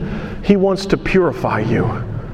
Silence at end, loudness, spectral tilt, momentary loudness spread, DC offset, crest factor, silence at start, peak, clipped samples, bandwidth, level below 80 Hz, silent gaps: 0 s; -17 LUFS; -7.5 dB/octave; 8 LU; under 0.1%; 16 dB; 0 s; 0 dBFS; under 0.1%; 10.5 kHz; -32 dBFS; none